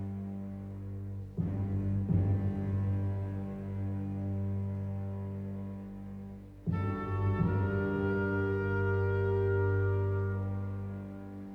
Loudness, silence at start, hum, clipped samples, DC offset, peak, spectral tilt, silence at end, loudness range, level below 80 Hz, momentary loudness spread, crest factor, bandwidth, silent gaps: -34 LUFS; 0 s; 50 Hz at -60 dBFS; under 0.1%; under 0.1%; -18 dBFS; -10.5 dB/octave; 0 s; 7 LU; -52 dBFS; 12 LU; 14 dB; 3.8 kHz; none